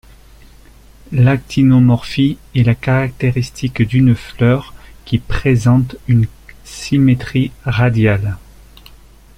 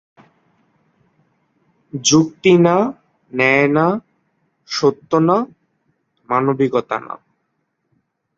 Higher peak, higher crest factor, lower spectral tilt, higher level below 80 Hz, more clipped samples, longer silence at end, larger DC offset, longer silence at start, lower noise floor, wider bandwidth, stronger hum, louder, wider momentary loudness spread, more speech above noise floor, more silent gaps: about the same, -2 dBFS vs -2 dBFS; about the same, 14 dB vs 18 dB; first, -7.5 dB/octave vs -4.5 dB/octave; first, -36 dBFS vs -60 dBFS; neither; second, 1 s vs 1.2 s; neither; second, 1.1 s vs 1.95 s; second, -42 dBFS vs -70 dBFS; first, 11 kHz vs 7.8 kHz; neither; about the same, -15 LUFS vs -16 LUFS; second, 9 LU vs 14 LU; second, 29 dB vs 55 dB; neither